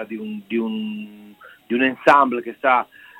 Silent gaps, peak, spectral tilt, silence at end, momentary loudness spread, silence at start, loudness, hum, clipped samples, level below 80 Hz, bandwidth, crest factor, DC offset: none; 0 dBFS; -6 dB/octave; 0.35 s; 16 LU; 0 s; -20 LUFS; none; under 0.1%; -64 dBFS; 16.5 kHz; 20 dB; under 0.1%